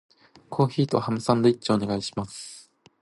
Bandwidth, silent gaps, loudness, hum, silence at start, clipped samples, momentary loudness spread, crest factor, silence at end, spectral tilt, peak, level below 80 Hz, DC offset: 11.5 kHz; none; -25 LUFS; none; 0.5 s; under 0.1%; 17 LU; 20 dB; 0.4 s; -6.5 dB/octave; -6 dBFS; -58 dBFS; under 0.1%